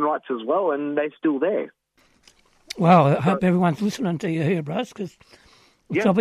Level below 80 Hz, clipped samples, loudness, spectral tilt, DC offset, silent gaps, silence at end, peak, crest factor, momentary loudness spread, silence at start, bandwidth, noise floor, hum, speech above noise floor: -62 dBFS; under 0.1%; -22 LUFS; -7.5 dB/octave; under 0.1%; none; 0 s; -4 dBFS; 18 dB; 14 LU; 0 s; 12 kHz; -58 dBFS; none; 37 dB